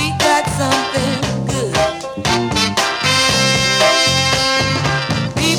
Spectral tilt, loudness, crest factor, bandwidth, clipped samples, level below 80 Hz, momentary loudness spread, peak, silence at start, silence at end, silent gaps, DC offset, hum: -3 dB/octave; -14 LUFS; 16 dB; 19 kHz; under 0.1%; -38 dBFS; 7 LU; 0 dBFS; 0 s; 0 s; none; under 0.1%; none